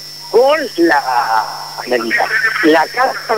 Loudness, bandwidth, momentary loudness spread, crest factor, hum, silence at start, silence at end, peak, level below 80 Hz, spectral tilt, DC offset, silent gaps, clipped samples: -13 LUFS; 16.5 kHz; 6 LU; 14 dB; 50 Hz at -45 dBFS; 0 s; 0 s; 0 dBFS; -58 dBFS; -3 dB/octave; 0.3%; none; under 0.1%